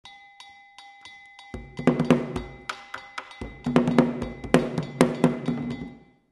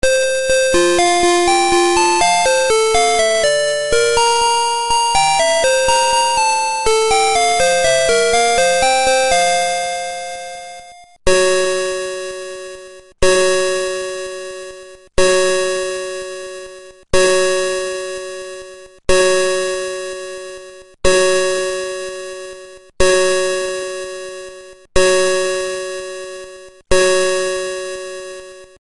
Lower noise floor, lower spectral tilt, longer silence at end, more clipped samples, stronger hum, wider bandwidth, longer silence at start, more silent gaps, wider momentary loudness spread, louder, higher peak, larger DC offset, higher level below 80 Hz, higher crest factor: first, -50 dBFS vs -39 dBFS; first, -6.5 dB/octave vs -2 dB/octave; first, 0.35 s vs 0.15 s; neither; neither; about the same, 12 kHz vs 11.5 kHz; about the same, 0.05 s vs 0.05 s; neither; first, 24 LU vs 17 LU; second, -25 LUFS vs -15 LUFS; about the same, 0 dBFS vs 0 dBFS; neither; second, -48 dBFS vs -36 dBFS; first, 26 dB vs 14 dB